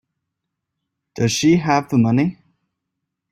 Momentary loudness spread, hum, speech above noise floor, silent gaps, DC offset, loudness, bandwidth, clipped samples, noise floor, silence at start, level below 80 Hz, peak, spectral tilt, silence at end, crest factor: 7 LU; none; 63 dB; none; under 0.1%; -18 LUFS; 15.5 kHz; under 0.1%; -79 dBFS; 1.15 s; -56 dBFS; -2 dBFS; -5.5 dB/octave; 1 s; 18 dB